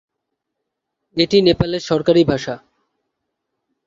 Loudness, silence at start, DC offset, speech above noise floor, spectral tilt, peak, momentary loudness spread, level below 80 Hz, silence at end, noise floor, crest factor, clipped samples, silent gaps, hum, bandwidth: -16 LUFS; 1.15 s; under 0.1%; 63 dB; -6 dB/octave; -2 dBFS; 14 LU; -46 dBFS; 1.3 s; -78 dBFS; 18 dB; under 0.1%; none; none; 7.6 kHz